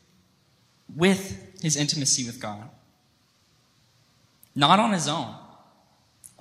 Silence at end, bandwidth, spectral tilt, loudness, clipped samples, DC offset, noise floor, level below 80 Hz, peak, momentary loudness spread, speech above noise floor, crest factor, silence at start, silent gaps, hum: 0.95 s; 15.5 kHz; -3.5 dB/octave; -23 LUFS; under 0.1%; under 0.1%; -64 dBFS; -64 dBFS; -4 dBFS; 19 LU; 41 dB; 24 dB; 0.9 s; none; none